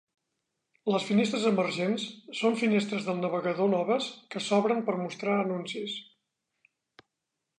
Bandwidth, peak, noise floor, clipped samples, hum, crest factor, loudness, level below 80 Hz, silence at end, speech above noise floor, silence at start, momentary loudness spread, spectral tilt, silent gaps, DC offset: 10.5 kHz; -12 dBFS; -85 dBFS; under 0.1%; none; 18 dB; -29 LUFS; -80 dBFS; 1.55 s; 57 dB; 0.85 s; 10 LU; -5.5 dB/octave; none; under 0.1%